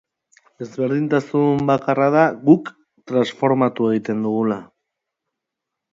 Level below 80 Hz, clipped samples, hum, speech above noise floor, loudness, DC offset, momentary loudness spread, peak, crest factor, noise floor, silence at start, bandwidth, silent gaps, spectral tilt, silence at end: -62 dBFS; under 0.1%; none; 65 dB; -19 LUFS; under 0.1%; 9 LU; 0 dBFS; 20 dB; -82 dBFS; 0.6 s; 7.6 kHz; none; -8 dB/octave; 1.3 s